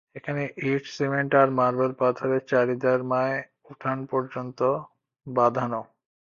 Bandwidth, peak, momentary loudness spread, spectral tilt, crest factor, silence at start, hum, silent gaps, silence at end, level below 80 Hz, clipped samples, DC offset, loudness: 7.2 kHz; -6 dBFS; 10 LU; -7.5 dB/octave; 20 dB; 0.15 s; none; none; 0.55 s; -68 dBFS; under 0.1%; under 0.1%; -25 LUFS